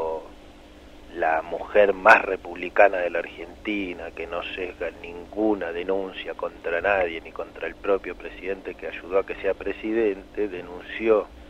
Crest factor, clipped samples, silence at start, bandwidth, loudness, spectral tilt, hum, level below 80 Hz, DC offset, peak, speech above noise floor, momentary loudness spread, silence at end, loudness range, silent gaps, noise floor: 24 dB; under 0.1%; 0 s; 10.5 kHz; -25 LUFS; -5.5 dB/octave; 50 Hz at -55 dBFS; -50 dBFS; under 0.1%; -2 dBFS; 22 dB; 15 LU; 0 s; 7 LU; none; -46 dBFS